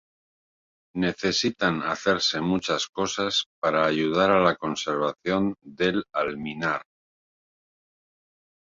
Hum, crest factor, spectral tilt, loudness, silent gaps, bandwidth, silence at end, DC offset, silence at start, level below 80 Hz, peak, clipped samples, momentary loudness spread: none; 20 dB; -4 dB/octave; -25 LUFS; 2.89-2.93 s, 3.46-3.62 s; 7.8 kHz; 1.8 s; under 0.1%; 0.95 s; -58 dBFS; -6 dBFS; under 0.1%; 7 LU